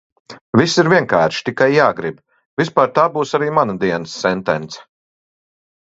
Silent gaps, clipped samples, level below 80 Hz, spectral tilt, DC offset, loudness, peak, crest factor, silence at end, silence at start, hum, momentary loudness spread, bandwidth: 0.41-0.53 s, 2.46-2.57 s; under 0.1%; -56 dBFS; -5.5 dB/octave; under 0.1%; -16 LUFS; 0 dBFS; 18 dB; 1.15 s; 0.3 s; none; 11 LU; 8 kHz